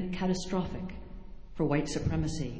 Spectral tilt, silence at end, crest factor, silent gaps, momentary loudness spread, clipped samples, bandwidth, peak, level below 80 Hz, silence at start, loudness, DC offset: -6 dB/octave; 0 s; 18 dB; none; 18 LU; under 0.1%; 8 kHz; -14 dBFS; -44 dBFS; 0 s; -32 LUFS; under 0.1%